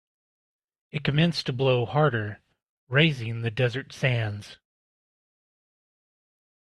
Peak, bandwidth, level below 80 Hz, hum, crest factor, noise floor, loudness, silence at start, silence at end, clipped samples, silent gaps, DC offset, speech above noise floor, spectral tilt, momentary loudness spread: -4 dBFS; 11.5 kHz; -60 dBFS; none; 24 dB; under -90 dBFS; -25 LUFS; 0.95 s; 2.25 s; under 0.1%; 2.69-2.87 s; under 0.1%; over 65 dB; -6.5 dB/octave; 10 LU